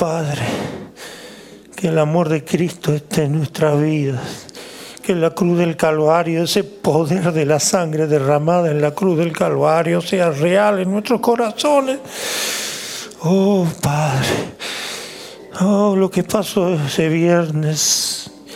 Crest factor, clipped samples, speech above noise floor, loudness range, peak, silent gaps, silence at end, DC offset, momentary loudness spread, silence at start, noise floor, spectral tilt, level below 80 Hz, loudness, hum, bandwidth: 16 dB; under 0.1%; 23 dB; 3 LU; -2 dBFS; none; 0 s; under 0.1%; 12 LU; 0 s; -39 dBFS; -5 dB/octave; -54 dBFS; -17 LUFS; none; 16.5 kHz